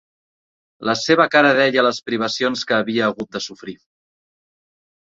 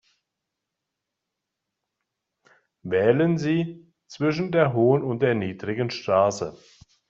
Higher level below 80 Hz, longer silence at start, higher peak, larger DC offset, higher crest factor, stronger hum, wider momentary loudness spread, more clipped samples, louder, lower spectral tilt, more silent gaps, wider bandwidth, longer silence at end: about the same, -64 dBFS vs -64 dBFS; second, 0.8 s vs 2.85 s; about the same, -2 dBFS vs -4 dBFS; neither; about the same, 18 dB vs 20 dB; neither; first, 15 LU vs 11 LU; neither; first, -18 LUFS vs -23 LUFS; second, -4 dB/octave vs -6 dB/octave; neither; about the same, 7.8 kHz vs 7.8 kHz; first, 1.4 s vs 0.55 s